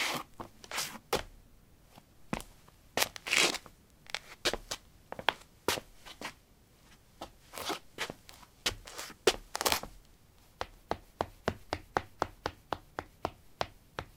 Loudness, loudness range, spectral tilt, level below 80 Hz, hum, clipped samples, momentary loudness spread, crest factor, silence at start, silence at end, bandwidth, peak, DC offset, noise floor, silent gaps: -36 LUFS; 7 LU; -2 dB/octave; -58 dBFS; none; under 0.1%; 17 LU; 36 dB; 0 s; 0.1 s; 17.5 kHz; -2 dBFS; under 0.1%; -62 dBFS; none